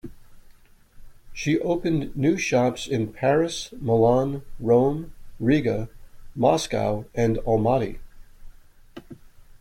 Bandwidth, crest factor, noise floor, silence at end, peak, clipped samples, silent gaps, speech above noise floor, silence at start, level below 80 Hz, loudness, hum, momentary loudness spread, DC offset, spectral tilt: 16 kHz; 18 dB; -51 dBFS; 0.1 s; -6 dBFS; under 0.1%; none; 29 dB; 0.05 s; -44 dBFS; -23 LUFS; none; 13 LU; under 0.1%; -6 dB/octave